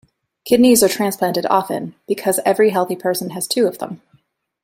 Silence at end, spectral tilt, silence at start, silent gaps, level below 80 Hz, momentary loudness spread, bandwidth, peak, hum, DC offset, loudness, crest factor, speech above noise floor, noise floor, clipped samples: 0.65 s; -4 dB/octave; 0.45 s; none; -58 dBFS; 15 LU; 16.5 kHz; -2 dBFS; none; under 0.1%; -17 LUFS; 16 dB; 42 dB; -59 dBFS; under 0.1%